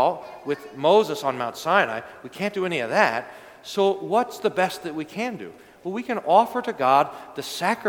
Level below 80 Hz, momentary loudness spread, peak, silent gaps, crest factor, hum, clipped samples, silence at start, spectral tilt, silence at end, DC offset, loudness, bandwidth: -70 dBFS; 14 LU; -2 dBFS; none; 22 dB; none; under 0.1%; 0 s; -4.5 dB/octave; 0 s; under 0.1%; -23 LUFS; 19 kHz